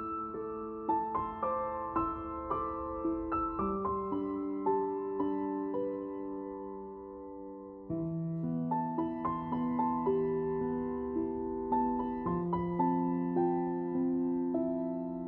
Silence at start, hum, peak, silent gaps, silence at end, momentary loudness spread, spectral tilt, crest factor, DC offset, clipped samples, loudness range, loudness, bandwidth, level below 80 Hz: 0 s; none; -20 dBFS; none; 0 s; 9 LU; -9.5 dB/octave; 14 dB; under 0.1%; under 0.1%; 5 LU; -34 LUFS; 3.7 kHz; -56 dBFS